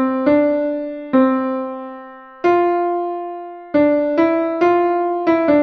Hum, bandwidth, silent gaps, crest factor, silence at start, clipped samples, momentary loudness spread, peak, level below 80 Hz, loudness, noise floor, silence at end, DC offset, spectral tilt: none; 6.2 kHz; none; 14 dB; 0 s; under 0.1%; 14 LU; -2 dBFS; -56 dBFS; -17 LUFS; -37 dBFS; 0 s; under 0.1%; -7.5 dB/octave